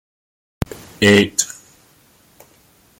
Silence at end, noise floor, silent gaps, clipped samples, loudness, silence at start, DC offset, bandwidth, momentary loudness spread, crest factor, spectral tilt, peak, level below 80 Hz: 1.55 s; -53 dBFS; none; under 0.1%; -17 LUFS; 1 s; under 0.1%; 17 kHz; 17 LU; 20 dB; -3.5 dB/octave; -2 dBFS; -46 dBFS